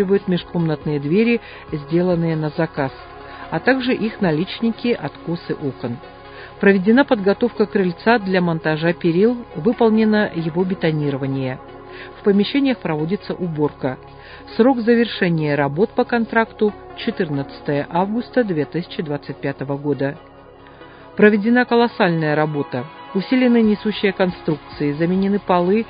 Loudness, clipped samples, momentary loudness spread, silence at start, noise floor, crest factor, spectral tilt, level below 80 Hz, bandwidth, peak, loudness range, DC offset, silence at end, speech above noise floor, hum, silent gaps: -19 LUFS; under 0.1%; 12 LU; 0 s; -42 dBFS; 18 dB; -11.5 dB/octave; -50 dBFS; 5.2 kHz; 0 dBFS; 4 LU; under 0.1%; 0 s; 24 dB; none; none